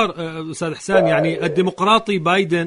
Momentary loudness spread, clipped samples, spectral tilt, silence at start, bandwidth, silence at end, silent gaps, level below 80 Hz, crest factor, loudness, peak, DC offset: 10 LU; under 0.1%; -5.5 dB/octave; 0 s; 11 kHz; 0 s; none; -54 dBFS; 16 dB; -18 LUFS; -2 dBFS; under 0.1%